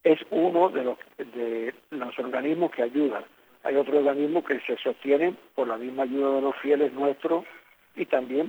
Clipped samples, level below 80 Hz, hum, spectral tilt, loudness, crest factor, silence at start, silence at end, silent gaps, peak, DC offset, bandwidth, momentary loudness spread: under 0.1%; -82 dBFS; none; -7 dB/octave; -26 LUFS; 18 dB; 0.05 s; 0 s; none; -8 dBFS; under 0.1%; over 20 kHz; 11 LU